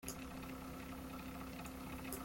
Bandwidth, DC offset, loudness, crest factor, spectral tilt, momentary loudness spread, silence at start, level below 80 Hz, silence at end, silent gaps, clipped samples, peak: 17 kHz; under 0.1%; -49 LUFS; 20 dB; -4.5 dB/octave; 2 LU; 0 s; -58 dBFS; 0 s; none; under 0.1%; -28 dBFS